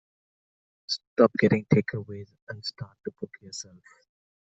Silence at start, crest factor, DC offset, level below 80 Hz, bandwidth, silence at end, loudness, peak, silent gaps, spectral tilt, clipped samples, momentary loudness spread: 0.9 s; 24 dB; under 0.1%; -64 dBFS; 8.2 kHz; 0.95 s; -26 LUFS; -4 dBFS; 1.07-1.16 s, 2.42-2.47 s; -6 dB/octave; under 0.1%; 20 LU